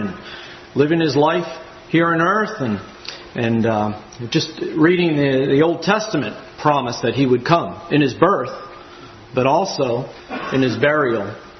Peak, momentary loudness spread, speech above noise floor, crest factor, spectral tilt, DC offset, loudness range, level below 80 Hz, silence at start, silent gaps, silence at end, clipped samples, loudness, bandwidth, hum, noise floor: 0 dBFS; 15 LU; 22 dB; 18 dB; -6 dB/octave; under 0.1%; 2 LU; -54 dBFS; 0 s; none; 0 s; under 0.1%; -18 LUFS; 6.4 kHz; none; -39 dBFS